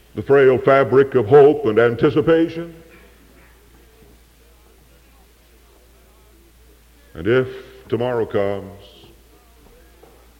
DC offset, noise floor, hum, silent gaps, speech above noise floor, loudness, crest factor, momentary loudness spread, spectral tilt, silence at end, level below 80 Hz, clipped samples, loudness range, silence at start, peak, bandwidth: under 0.1%; -50 dBFS; none; none; 35 dB; -16 LUFS; 16 dB; 18 LU; -8 dB/octave; 1.65 s; -50 dBFS; under 0.1%; 12 LU; 0.15 s; -2 dBFS; 6.8 kHz